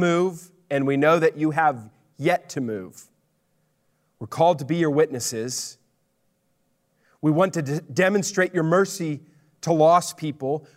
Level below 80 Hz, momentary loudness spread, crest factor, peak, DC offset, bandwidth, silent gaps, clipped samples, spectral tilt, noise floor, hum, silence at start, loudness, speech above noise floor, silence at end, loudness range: -72 dBFS; 15 LU; 18 dB; -6 dBFS; under 0.1%; 16 kHz; none; under 0.1%; -5.5 dB/octave; -69 dBFS; none; 0 s; -22 LUFS; 47 dB; 0.15 s; 4 LU